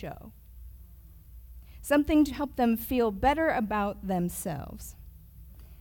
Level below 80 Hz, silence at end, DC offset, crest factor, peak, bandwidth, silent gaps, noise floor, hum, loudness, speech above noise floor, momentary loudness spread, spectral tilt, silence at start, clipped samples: -46 dBFS; 0.05 s; under 0.1%; 18 dB; -12 dBFS; 18 kHz; none; -50 dBFS; none; -28 LUFS; 23 dB; 19 LU; -5.5 dB/octave; 0 s; under 0.1%